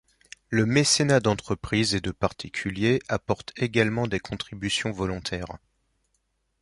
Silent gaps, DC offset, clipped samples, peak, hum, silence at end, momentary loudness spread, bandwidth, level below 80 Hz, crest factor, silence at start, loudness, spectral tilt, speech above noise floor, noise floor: none; under 0.1%; under 0.1%; -6 dBFS; none; 1.05 s; 12 LU; 11.5 kHz; -48 dBFS; 22 dB; 0.5 s; -25 LUFS; -4.5 dB/octave; 48 dB; -74 dBFS